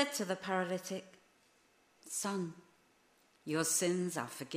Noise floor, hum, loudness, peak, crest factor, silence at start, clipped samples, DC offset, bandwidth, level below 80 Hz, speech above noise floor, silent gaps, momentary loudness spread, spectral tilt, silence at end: -70 dBFS; none; -37 LUFS; -18 dBFS; 22 dB; 0 s; under 0.1%; under 0.1%; 15.5 kHz; -84 dBFS; 34 dB; none; 13 LU; -3.5 dB/octave; 0 s